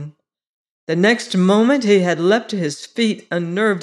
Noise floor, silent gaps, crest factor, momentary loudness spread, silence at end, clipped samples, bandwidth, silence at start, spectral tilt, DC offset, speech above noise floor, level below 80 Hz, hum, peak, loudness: -37 dBFS; 0.49-0.87 s; 14 dB; 10 LU; 0 s; under 0.1%; 11.5 kHz; 0 s; -5.5 dB/octave; under 0.1%; 20 dB; -70 dBFS; none; -4 dBFS; -17 LUFS